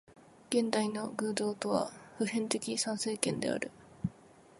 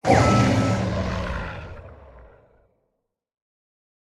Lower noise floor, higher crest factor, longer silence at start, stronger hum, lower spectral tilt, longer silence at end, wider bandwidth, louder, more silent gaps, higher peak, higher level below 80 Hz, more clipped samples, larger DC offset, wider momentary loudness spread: second, -58 dBFS vs -77 dBFS; about the same, 24 dB vs 20 dB; about the same, 0.1 s vs 0.05 s; neither; second, -4 dB/octave vs -6 dB/octave; second, 0.45 s vs 1.8 s; about the same, 12 kHz vs 11.5 kHz; second, -34 LUFS vs -21 LUFS; neither; second, -12 dBFS vs -4 dBFS; second, -68 dBFS vs -38 dBFS; neither; neither; second, 9 LU vs 21 LU